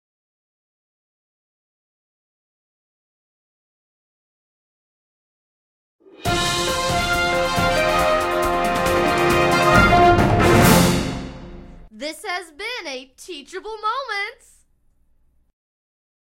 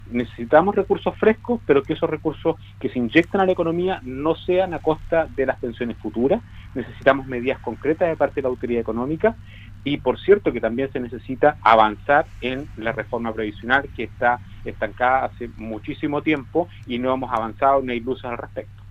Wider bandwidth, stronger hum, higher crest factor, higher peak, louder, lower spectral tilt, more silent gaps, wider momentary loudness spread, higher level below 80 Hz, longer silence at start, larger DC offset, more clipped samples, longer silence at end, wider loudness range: first, 16.5 kHz vs 8 kHz; neither; about the same, 20 dB vs 20 dB; about the same, 0 dBFS vs 0 dBFS; first, -18 LUFS vs -22 LUFS; second, -4.5 dB/octave vs -7.5 dB/octave; neither; first, 19 LU vs 12 LU; first, -36 dBFS vs -44 dBFS; first, 6.2 s vs 0 s; neither; neither; first, 2 s vs 0 s; first, 14 LU vs 4 LU